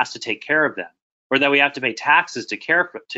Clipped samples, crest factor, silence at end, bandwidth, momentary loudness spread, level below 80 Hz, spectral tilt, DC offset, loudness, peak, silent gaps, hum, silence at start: under 0.1%; 18 dB; 0 s; 8 kHz; 11 LU; -72 dBFS; -3 dB/octave; under 0.1%; -19 LUFS; -2 dBFS; 1.02-1.30 s; none; 0 s